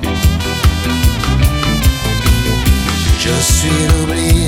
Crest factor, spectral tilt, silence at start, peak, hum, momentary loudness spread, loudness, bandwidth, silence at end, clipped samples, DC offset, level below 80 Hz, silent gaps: 12 dB; -4.5 dB/octave; 0 s; 0 dBFS; none; 3 LU; -13 LUFS; 17.5 kHz; 0 s; under 0.1%; under 0.1%; -16 dBFS; none